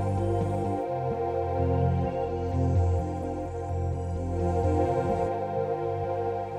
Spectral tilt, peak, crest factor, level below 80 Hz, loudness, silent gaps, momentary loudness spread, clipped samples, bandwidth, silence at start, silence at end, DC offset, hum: -9 dB/octave; -14 dBFS; 12 dB; -40 dBFS; -28 LUFS; none; 6 LU; under 0.1%; 9.2 kHz; 0 s; 0 s; under 0.1%; none